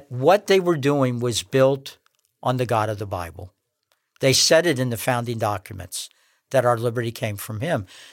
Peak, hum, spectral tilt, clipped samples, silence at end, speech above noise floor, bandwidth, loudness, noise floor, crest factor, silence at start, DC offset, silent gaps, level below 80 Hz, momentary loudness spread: -4 dBFS; none; -4.5 dB/octave; under 0.1%; 0.05 s; 50 dB; 17 kHz; -22 LUFS; -71 dBFS; 18 dB; 0.1 s; under 0.1%; none; -58 dBFS; 15 LU